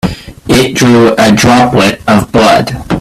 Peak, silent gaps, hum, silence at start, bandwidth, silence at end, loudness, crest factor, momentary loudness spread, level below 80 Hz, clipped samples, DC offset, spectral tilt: 0 dBFS; none; none; 0.05 s; 15 kHz; 0 s; -7 LUFS; 8 dB; 7 LU; -30 dBFS; 0.2%; under 0.1%; -5 dB/octave